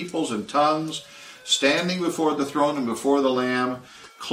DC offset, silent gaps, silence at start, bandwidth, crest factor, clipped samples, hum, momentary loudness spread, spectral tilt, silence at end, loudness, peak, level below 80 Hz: under 0.1%; none; 0 s; 16 kHz; 18 dB; under 0.1%; none; 14 LU; -3.5 dB/octave; 0 s; -23 LUFS; -6 dBFS; -68 dBFS